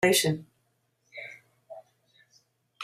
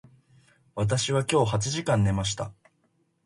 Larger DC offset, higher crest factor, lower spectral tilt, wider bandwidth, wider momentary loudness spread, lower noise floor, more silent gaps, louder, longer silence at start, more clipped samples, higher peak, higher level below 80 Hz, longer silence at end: neither; about the same, 22 dB vs 20 dB; second, -3.5 dB/octave vs -5 dB/octave; first, 15.5 kHz vs 11.5 kHz; first, 26 LU vs 10 LU; about the same, -73 dBFS vs -70 dBFS; neither; about the same, -28 LUFS vs -26 LUFS; second, 0 s vs 0.75 s; neither; about the same, -10 dBFS vs -8 dBFS; second, -70 dBFS vs -48 dBFS; second, 0 s vs 0.75 s